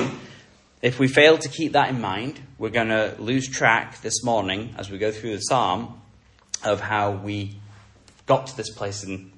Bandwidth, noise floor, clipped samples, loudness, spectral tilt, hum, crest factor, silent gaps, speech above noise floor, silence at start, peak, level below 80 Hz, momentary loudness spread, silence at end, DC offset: 11.5 kHz; -54 dBFS; under 0.1%; -23 LUFS; -4 dB/octave; none; 22 dB; none; 31 dB; 0 s; -2 dBFS; -58 dBFS; 14 LU; 0.1 s; under 0.1%